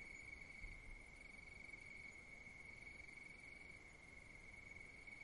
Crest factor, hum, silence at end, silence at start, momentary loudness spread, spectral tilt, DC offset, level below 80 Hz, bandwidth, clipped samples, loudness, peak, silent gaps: 16 dB; none; 0 s; 0 s; 4 LU; -3.5 dB/octave; under 0.1%; -66 dBFS; 11 kHz; under 0.1%; -57 LUFS; -42 dBFS; none